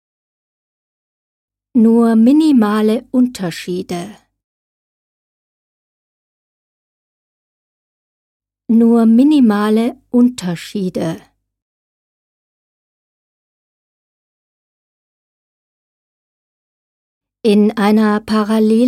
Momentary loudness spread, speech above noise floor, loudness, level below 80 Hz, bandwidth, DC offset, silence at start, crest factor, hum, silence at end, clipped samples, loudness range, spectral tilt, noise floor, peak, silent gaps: 13 LU; over 78 dB; -13 LUFS; -58 dBFS; 14 kHz; under 0.1%; 1.75 s; 16 dB; none; 0 s; under 0.1%; 14 LU; -7 dB/octave; under -90 dBFS; -2 dBFS; 4.44-8.40 s, 11.62-17.21 s